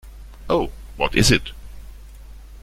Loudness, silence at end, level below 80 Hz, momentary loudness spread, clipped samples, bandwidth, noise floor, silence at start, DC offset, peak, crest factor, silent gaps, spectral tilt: -20 LUFS; 0.05 s; -34 dBFS; 26 LU; under 0.1%; 16 kHz; -39 dBFS; 0.05 s; under 0.1%; -2 dBFS; 22 dB; none; -4 dB/octave